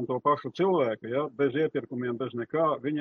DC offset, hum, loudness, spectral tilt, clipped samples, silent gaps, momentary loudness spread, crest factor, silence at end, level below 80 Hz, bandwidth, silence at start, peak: under 0.1%; none; -28 LUFS; -8.5 dB/octave; under 0.1%; none; 6 LU; 16 dB; 0 s; -74 dBFS; 6.6 kHz; 0 s; -12 dBFS